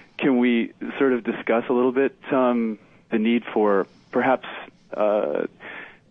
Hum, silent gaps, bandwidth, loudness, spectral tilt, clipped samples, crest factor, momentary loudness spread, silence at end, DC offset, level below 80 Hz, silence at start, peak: none; none; 4 kHz; -23 LUFS; -8.5 dB/octave; under 0.1%; 16 dB; 16 LU; 0.2 s; under 0.1%; -70 dBFS; 0.2 s; -6 dBFS